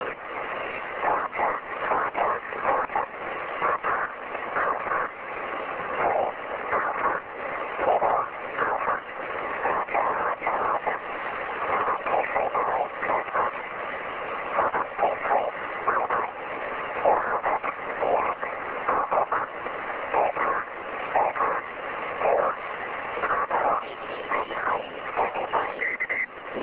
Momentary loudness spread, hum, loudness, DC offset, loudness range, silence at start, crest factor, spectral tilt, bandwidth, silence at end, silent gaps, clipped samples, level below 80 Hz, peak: 7 LU; none; -27 LUFS; under 0.1%; 1 LU; 0 s; 18 dB; -7.5 dB/octave; 4 kHz; 0 s; none; under 0.1%; -60 dBFS; -8 dBFS